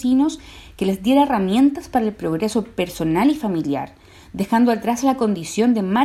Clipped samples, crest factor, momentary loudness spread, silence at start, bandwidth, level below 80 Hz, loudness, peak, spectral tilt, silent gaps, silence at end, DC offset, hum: under 0.1%; 14 dB; 9 LU; 0 s; 14 kHz; -48 dBFS; -19 LUFS; -6 dBFS; -6 dB/octave; none; 0 s; under 0.1%; none